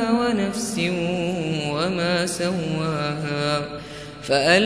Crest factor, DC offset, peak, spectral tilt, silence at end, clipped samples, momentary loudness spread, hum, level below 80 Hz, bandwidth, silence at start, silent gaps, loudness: 20 dB; 0.1%; -2 dBFS; -4.5 dB/octave; 0 s; under 0.1%; 5 LU; none; -52 dBFS; 11 kHz; 0 s; none; -23 LUFS